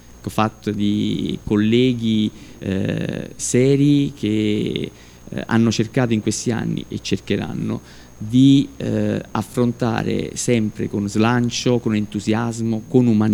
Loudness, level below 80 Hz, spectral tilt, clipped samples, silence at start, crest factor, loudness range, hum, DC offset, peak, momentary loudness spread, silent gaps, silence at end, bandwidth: -20 LUFS; -46 dBFS; -6 dB/octave; under 0.1%; 0.15 s; 18 dB; 2 LU; none; under 0.1%; -2 dBFS; 10 LU; none; 0 s; 19 kHz